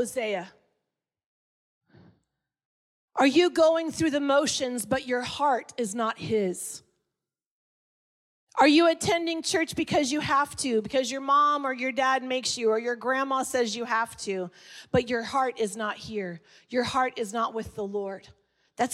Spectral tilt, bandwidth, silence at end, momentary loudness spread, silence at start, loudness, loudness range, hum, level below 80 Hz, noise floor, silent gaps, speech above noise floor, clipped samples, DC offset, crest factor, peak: -3.5 dB/octave; 15.5 kHz; 0 s; 13 LU; 0 s; -26 LUFS; 6 LU; none; -64 dBFS; -87 dBFS; 1.26-1.81 s, 2.65-3.08 s, 7.46-8.47 s; 61 dB; under 0.1%; under 0.1%; 18 dB; -10 dBFS